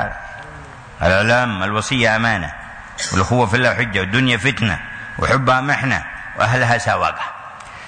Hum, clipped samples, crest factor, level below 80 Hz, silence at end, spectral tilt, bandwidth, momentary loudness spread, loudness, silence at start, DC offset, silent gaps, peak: none; under 0.1%; 14 dB; -40 dBFS; 0 s; -4.5 dB/octave; 9.6 kHz; 18 LU; -17 LUFS; 0 s; under 0.1%; none; -4 dBFS